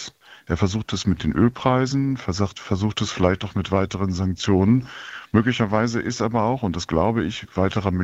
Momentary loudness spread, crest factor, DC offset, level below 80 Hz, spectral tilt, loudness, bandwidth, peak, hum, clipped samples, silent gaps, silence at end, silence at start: 6 LU; 20 dB; under 0.1%; -46 dBFS; -6 dB/octave; -22 LUFS; 8 kHz; -2 dBFS; none; under 0.1%; none; 0 s; 0 s